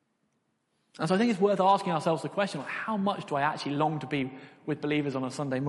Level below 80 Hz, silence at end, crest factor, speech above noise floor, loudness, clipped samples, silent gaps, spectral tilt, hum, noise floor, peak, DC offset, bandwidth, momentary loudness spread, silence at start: -72 dBFS; 0 s; 18 dB; 47 dB; -29 LUFS; under 0.1%; none; -6 dB/octave; none; -75 dBFS; -12 dBFS; under 0.1%; 11.5 kHz; 10 LU; 1 s